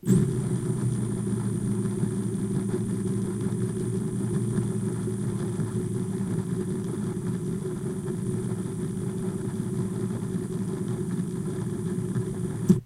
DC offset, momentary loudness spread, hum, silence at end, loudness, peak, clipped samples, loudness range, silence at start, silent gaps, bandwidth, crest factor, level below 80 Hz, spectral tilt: under 0.1%; 3 LU; none; 0 s; -29 LUFS; -6 dBFS; under 0.1%; 2 LU; 0.05 s; none; 15.5 kHz; 22 dB; -50 dBFS; -7.5 dB/octave